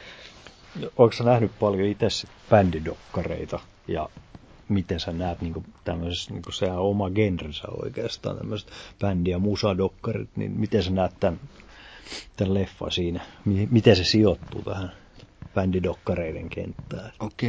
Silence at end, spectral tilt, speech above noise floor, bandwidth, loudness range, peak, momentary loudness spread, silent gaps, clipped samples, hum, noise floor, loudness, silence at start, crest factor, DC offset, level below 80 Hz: 0 s; -6.5 dB/octave; 23 dB; 8 kHz; 6 LU; -2 dBFS; 16 LU; none; under 0.1%; none; -47 dBFS; -26 LUFS; 0 s; 24 dB; under 0.1%; -42 dBFS